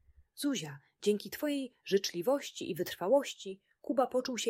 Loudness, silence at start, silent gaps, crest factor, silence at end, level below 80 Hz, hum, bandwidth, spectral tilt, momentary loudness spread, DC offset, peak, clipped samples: -34 LUFS; 0.35 s; none; 18 dB; 0 s; -74 dBFS; none; 16 kHz; -4 dB/octave; 11 LU; under 0.1%; -16 dBFS; under 0.1%